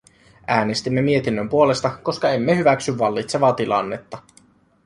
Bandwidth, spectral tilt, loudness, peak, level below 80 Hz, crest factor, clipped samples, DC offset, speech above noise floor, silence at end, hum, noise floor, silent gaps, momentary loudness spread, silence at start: 11.5 kHz; -5.5 dB/octave; -20 LUFS; -2 dBFS; -56 dBFS; 18 dB; under 0.1%; under 0.1%; 35 dB; 0.65 s; none; -55 dBFS; none; 12 LU; 0.5 s